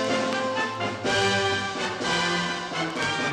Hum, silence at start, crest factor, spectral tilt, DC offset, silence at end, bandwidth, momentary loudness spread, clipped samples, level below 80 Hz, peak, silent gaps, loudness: none; 0 s; 16 dB; -3.5 dB/octave; under 0.1%; 0 s; 13.5 kHz; 6 LU; under 0.1%; -58 dBFS; -10 dBFS; none; -25 LUFS